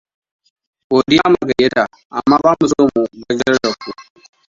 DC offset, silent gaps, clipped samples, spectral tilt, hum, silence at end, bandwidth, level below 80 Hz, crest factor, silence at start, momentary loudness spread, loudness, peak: under 0.1%; 2.05-2.10 s; under 0.1%; -5 dB/octave; none; 0.45 s; 7.8 kHz; -50 dBFS; 16 dB; 0.9 s; 8 LU; -15 LUFS; 0 dBFS